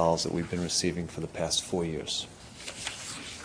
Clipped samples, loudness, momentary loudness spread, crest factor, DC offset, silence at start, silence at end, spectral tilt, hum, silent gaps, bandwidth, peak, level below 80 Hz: under 0.1%; -31 LUFS; 10 LU; 20 dB; under 0.1%; 0 s; 0 s; -3.5 dB/octave; none; none; 11 kHz; -12 dBFS; -54 dBFS